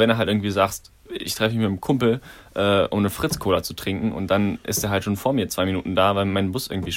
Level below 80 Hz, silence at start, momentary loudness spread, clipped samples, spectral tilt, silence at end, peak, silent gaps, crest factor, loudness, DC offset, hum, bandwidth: -48 dBFS; 0 s; 8 LU; under 0.1%; -5 dB/octave; 0 s; -4 dBFS; none; 18 dB; -22 LUFS; under 0.1%; none; 16.5 kHz